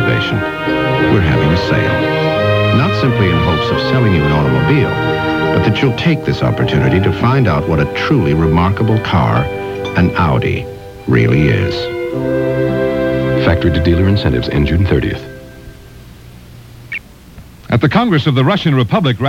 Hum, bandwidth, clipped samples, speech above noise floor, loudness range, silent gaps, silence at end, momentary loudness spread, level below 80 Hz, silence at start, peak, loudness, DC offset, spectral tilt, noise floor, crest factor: none; 15.5 kHz; under 0.1%; 24 dB; 4 LU; none; 0 s; 6 LU; -30 dBFS; 0 s; 0 dBFS; -13 LUFS; 0.2%; -7.5 dB/octave; -36 dBFS; 12 dB